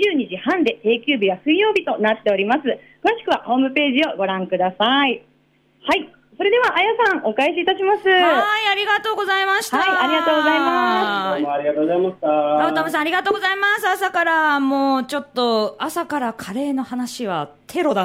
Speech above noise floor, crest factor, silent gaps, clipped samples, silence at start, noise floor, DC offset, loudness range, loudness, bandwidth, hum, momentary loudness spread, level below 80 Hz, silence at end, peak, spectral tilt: 40 dB; 14 dB; none; under 0.1%; 0 s; -59 dBFS; under 0.1%; 3 LU; -18 LUFS; 16 kHz; none; 8 LU; -64 dBFS; 0 s; -6 dBFS; -4 dB/octave